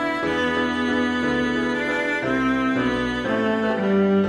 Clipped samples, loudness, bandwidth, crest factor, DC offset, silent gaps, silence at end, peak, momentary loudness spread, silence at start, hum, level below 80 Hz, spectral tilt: under 0.1%; -22 LUFS; 11.5 kHz; 12 dB; under 0.1%; none; 0 s; -10 dBFS; 2 LU; 0 s; none; -46 dBFS; -6 dB/octave